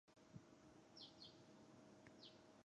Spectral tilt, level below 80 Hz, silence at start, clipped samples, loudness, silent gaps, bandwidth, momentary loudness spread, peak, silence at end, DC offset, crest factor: -4.5 dB/octave; -88 dBFS; 0.05 s; under 0.1%; -64 LUFS; none; 10 kHz; 6 LU; -46 dBFS; 0 s; under 0.1%; 20 dB